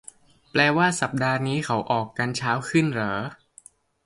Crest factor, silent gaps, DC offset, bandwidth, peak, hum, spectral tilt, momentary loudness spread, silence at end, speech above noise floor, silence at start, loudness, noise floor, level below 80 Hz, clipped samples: 22 dB; none; under 0.1%; 11.5 kHz; -2 dBFS; none; -5 dB/octave; 7 LU; 0.7 s; 30 dB; 0.55 s; -24 LUFS; -53 dBFS; -60 dBFS; under 0.1%